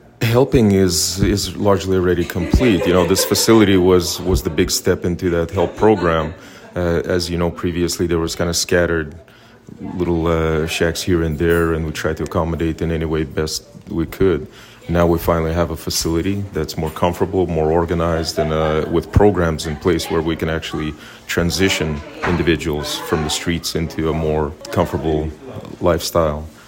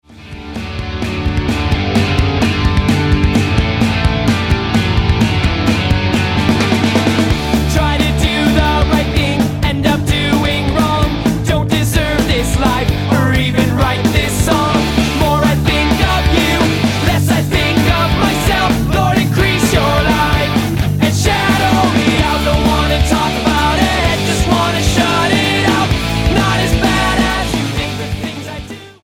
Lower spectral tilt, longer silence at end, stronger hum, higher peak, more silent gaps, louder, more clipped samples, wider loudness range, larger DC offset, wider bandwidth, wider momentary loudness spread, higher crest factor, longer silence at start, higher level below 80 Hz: about the same, -5 dB/octave vs -5 dB/octave; about the same, 0.05 s vs 0.1 s; neither; about the same, 0 dBFS vs 0 dBFS; neither; second, -18 LUFS vs -13 LUFS; neither; first, 5 LU vs 1 LU; neither; about the same, 16.5 kHz vs 17 kHz; first, 9 LU vs 4 LU; first, 18 dB vs 12 dB; about the same, 0.2 s vs 0.1 s; second, -34 dBFS vs -22 dBFS